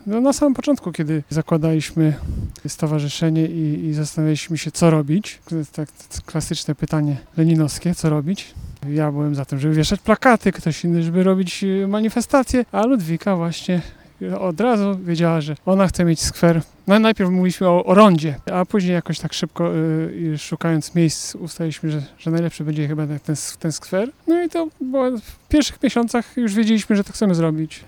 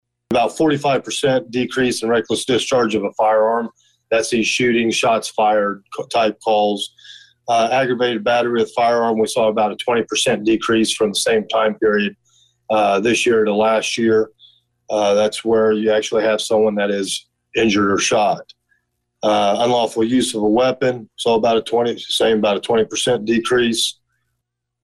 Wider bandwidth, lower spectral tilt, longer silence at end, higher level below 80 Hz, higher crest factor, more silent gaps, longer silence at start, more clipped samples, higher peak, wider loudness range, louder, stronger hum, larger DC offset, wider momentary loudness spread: first, 17.5 kHz vs 12.5 kHz; first, -6 dB/octave vs -3.5 dB/octave; second, 0.05 s vs 0.9 s; first, -42 dBFS vs -56 dBFS; first, 18 dB vs 10 dB; neither; second, 0.05 s vs 0.3 s; neither; first, 0 dBFS vs -8 dBFS; first, 6 LU vs 1 LU; about the same, -19 LUFS vs -17 LUFS; neither; neither; first, 9 LU vs 5 LU